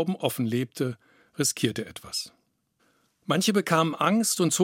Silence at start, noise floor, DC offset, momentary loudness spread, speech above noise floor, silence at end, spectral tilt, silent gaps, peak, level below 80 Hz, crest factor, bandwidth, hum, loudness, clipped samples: 0 s; -70 dBFS; under 0.1%; 15 LU; 45 dB; 0 s; -4 dB/octave; none; -6 dBFS; -70 dBFS; 22 dB; 16.5 kHz; none; -26 LUFS; under 0.1%